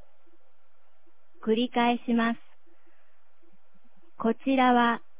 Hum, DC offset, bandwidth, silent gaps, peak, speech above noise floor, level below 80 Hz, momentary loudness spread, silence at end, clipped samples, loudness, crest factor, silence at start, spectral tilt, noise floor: none; 1%; 4 kHz; none; -10 dBFS; 46 dB; -74 dBFS; 9 LU; 0.2 s; under 0.1%; -26 LUFS; 20 dB; 1.45 s; -2.5 dB/octave; -70 dBFS